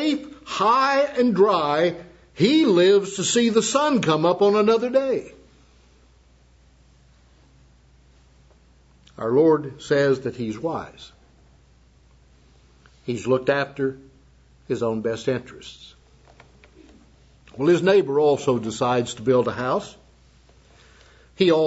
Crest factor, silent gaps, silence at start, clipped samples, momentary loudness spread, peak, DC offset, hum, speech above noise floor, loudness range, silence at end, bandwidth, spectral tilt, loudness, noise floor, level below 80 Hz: 18 dB; none; 0 s; under 0.1%; 12 LU; -4 dBFS; under 0.1%; none; 35 dB; 11 LU; 0 s; 8 kHz; -5 dB/octave; -21 LUFS; -55 dBFS; -56 dBFS